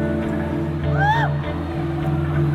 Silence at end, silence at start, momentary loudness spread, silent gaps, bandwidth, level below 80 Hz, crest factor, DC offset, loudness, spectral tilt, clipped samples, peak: 0 s; 0 s; 6 LU; none; 7.4 kHz; -34 dBFS; 14 dB; under 0.1%; -22 LUFS; -8.5 dB/octave; under 0.1%; -6 dBFS